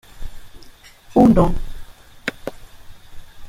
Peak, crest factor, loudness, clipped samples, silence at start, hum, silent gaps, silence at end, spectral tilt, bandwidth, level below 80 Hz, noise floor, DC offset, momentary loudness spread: -2 dBFS; 18 dB; -17 LUFS; under 0.1%; 0.15 s; none; none; 0 s; -8 dB/octave; 15.5 kHz; -30 dBFS; -43 dBFS; under 0.1%; 28 LU